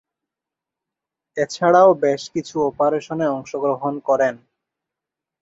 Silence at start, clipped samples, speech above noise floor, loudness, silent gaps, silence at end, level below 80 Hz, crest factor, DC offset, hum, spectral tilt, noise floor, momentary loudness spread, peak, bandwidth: 1.35 s; under 0.1%; 68 dB; -19 LUFS; none; 1.05 s; -64 dBFS; 18 dB; under 0.1%; none; -5.5 dB/octave; -86 dBFS; 12 LU; -2 dBFS; 8 kHz